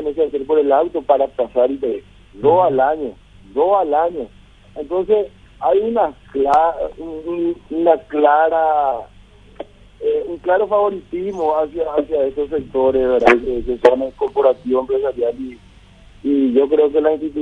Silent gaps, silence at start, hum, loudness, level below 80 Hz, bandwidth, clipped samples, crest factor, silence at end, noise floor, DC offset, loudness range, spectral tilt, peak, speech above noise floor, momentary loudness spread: none; 0 s; 50 Hz at -50 dBFS; -17 LUFS; -44 dBFS; 7.6 kHz; under 0.1%; 18 dB; 0 s; -44 dBFS; under 0.1%; 3 LU; -7 dB/octave; 0 dBFS; 28 dB; 13 LU